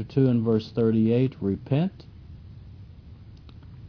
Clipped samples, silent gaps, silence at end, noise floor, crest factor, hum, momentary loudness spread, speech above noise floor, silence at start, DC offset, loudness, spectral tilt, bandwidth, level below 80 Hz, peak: under 0.1%; none; 0 s; -46 dBFS; 16 dB; none; 24 LU; 22 dB; 0 s; under 0.1%; -24 LUFS; -10.5 dB/octave; 5.4 kHz; -52 dBFS; -10 dBFS